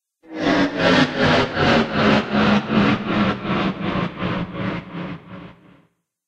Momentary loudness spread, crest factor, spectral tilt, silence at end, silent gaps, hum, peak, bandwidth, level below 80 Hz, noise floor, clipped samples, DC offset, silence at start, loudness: 15 LU; 18 dB; -6 dB/octave; 0.75 s; none; none; -2 dBFS; 8.8 kHz; -44 dBFS; -61 dBFS; under 0.1%; under 0.1%; 0.3 s; -19 LUFS